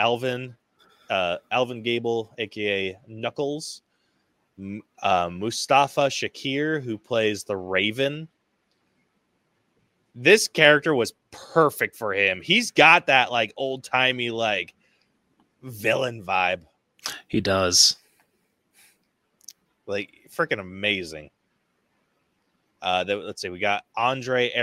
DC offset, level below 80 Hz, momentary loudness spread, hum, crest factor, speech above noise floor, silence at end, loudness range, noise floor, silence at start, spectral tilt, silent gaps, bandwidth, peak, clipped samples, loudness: under 0.1%; -66 dBFS; 17 LU; none; 24 dB; 48 dB; 0 s; 10 LU; -72 dBFS; 0 s; -3 dB/octave; none; 16 kHz; 0 dBFS; under 0.1%; -22 LUFS